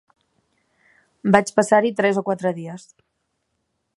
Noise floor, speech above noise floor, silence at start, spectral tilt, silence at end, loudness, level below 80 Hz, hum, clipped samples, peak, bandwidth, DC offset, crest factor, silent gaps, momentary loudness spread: -74 dBFS; 55 dB; 1.25 s; -5.5 dB/octave; 1.2 s; -19 LUFS; -62 dBFS; none; under 0.1%; 0 dBFS; 11.5 kHz; under 0.1%; 22 dB; none; 16 LU